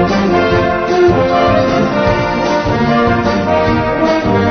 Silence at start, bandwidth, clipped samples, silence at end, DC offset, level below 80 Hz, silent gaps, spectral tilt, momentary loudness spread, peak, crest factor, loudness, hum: 0 s; 6.6 kHz; under 0.1%; 0 s; under 0.1%; -30 dBFS; none; -6.5 dB/octave; 3 LU; 0 dBFS; 12 dB; -12 LUFS; none